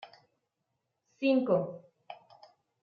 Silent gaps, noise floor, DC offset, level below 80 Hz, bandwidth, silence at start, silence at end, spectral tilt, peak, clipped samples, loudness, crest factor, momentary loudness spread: none; -83 dBFS; under 0.1%; -82 dBFS; 6.4 kHz; 0 s; 0.7 s; -8.5 dB/octave; -14 dBFS; under 0.1%; -30 LUFS; 20 dB; 24 LU